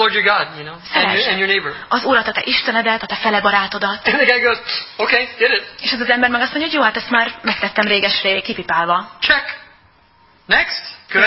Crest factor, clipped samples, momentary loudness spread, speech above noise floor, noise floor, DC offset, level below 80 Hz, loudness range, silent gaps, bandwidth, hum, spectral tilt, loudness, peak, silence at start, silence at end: 18 dB; under 0.1%; 6 LU; 35 dB; -52 dBFS; under 0.1%; -52 dBFS; 2 LU; none; 8 kHz; none; -6 dB/octave; -16 LUFS; 0 dBFS; 0 s; 0 s